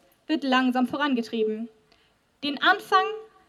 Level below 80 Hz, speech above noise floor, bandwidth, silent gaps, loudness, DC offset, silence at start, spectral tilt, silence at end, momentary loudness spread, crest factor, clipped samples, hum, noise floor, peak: -74 dBFS; 39 dB; 14 kHz; none; -25 LUFS; under 0.1%; 0.3 s; -4 dB/octave; 0.25 s; 10 LU; 20 dB; under 0.1%; none; -64 dBFS; -6 dBFS